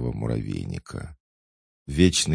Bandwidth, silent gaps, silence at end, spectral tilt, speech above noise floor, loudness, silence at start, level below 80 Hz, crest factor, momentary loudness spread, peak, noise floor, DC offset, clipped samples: 10.5 kHz; 1.20-1.86 s; 0 s; -4.5 dB/octave; over 66 dB; -25 LUFS; 0 s; -42 dBFS; 22 dB; 20 LU; -4 dBFS; under -90 dBFS; under 0.1%; under 0.1%